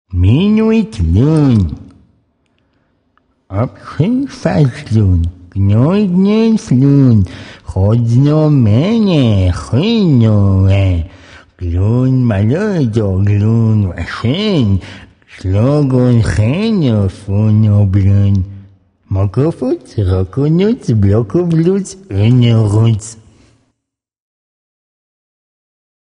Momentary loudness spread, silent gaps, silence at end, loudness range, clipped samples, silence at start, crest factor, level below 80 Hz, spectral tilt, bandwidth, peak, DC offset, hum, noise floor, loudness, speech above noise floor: 9 LU; none; 2.85 s; 5 LU; under 0.1%; 0.1 s; 12 dB; -32 dBFS; -8 dB/octave; 10 kHz; 0 dBFS; under 0.1%; none; -75 dBFS; -12 LUFS; 64 dB